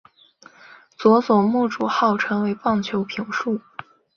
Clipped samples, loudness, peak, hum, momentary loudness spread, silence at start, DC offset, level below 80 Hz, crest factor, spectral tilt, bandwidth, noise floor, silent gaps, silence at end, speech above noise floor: under 0.1%; -21 LUFS; -2 dBFS; none; 10 LU; 1 s; under 0.1%; -64 dBFS; 20 dB; -6.5 dB/octave; 6.8 kHz; -51 dBFS; none; 0.35 s; 31 dB